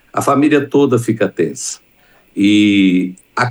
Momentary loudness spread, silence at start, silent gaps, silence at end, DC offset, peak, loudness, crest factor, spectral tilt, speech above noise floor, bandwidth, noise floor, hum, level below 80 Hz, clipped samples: 13 LU; 0.15 s; none; 0 s; under 0.1%; -2 dBFS; -14 LUFS; 14 dB; -5.5 dB/octave; 37 dB; 12.5 kHz; -51 dBFS; none; -62 dBFS; under 0.1%